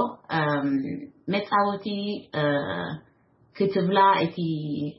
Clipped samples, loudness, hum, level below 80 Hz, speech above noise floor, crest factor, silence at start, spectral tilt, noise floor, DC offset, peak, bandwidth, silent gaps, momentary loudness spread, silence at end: under 0.1%; -25 LUFS; none; -68 dBFS; 31 dB; 18 dB; 0 s; -10.5 dB/octave; -56 dBFS; under 0.1%; -8 dBFS; 5.8 kHz; none; 12 LU; 0.05 s